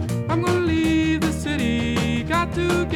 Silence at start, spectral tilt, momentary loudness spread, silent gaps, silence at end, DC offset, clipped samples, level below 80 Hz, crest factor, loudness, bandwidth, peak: 0 s; -6 dB/octave; 3 LU; none; 0 s; under 0.1%; under 0.1%; -36 dBFS; 14 dB; -21 LUFS; 16 kHz; -8 dBFS